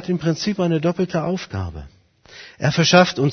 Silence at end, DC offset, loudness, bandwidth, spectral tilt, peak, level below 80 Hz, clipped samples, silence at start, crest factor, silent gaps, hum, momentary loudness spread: 0 s; under 0.1%; -19 LUFS; 6.6 kHz; -5 dB/octave; 0 dBFS; -46 dBFS; under 0.1%; 0 s; 20 dB; none; none; 15 LU